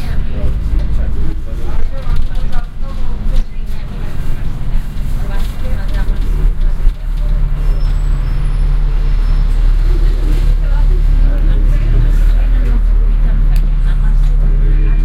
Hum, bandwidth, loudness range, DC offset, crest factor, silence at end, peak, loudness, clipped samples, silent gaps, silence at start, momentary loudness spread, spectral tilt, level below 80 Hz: none; 4.7 kHz; 7 LU; under 0.1%; 10 dB; 0 s; 0 dBFS; -18 LUFS; under 0.1%; none; 0 s; 8 LU; -7.5 dB/octave; -10 dBFS